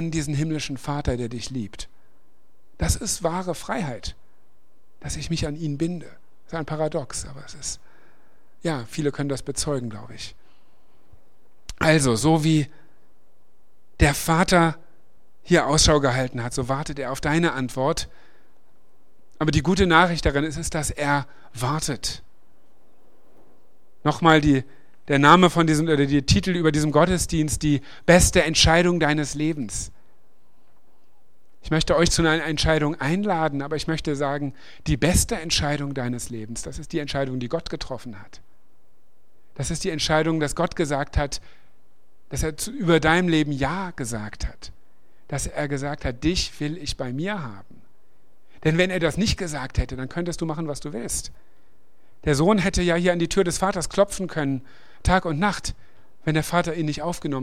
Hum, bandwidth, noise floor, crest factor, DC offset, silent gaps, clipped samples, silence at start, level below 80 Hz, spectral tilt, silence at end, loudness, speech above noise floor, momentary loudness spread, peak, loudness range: none; 16 kHz; -66 dBFS; 24 dB; 1%; none; under 0.1%; 0 s; -36 dBFS; -4.5 dB/octave; 0 s; -23 LUFS; 44 dB; 15 LU; 0 dBFS; 11 LU